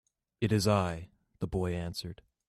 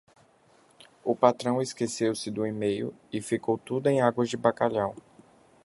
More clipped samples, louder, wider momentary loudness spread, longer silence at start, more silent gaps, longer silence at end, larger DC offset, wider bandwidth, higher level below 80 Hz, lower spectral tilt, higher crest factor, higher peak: neither; second, -32 LUFS vs -28 LUFS; first, 14 LU vs 9 LU; second, 0.4 s vs 1.05 s; neither; second, 0.35 s vs 0.65 s; neither; first, 14 kHz vs 11.5 kHz; first, -54 dBFS vs -66 dBFS; about the same, -6 dB/octave vs -5.5 dB/octave; second, 18 dB vs 24 dB; second, -14 dBFS vs -4 dBFS